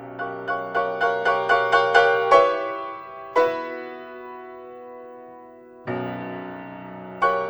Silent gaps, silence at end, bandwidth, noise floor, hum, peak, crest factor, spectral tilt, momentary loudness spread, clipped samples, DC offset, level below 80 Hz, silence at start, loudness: none; 0 s; over 20 kHz; -45 dBFS; none; -2 dBFS; 22 dB; -4.5 dB/octave; 23 LU; under 0.1%; under 0.1%; -64 dBFS; 0 s; -21 LUFS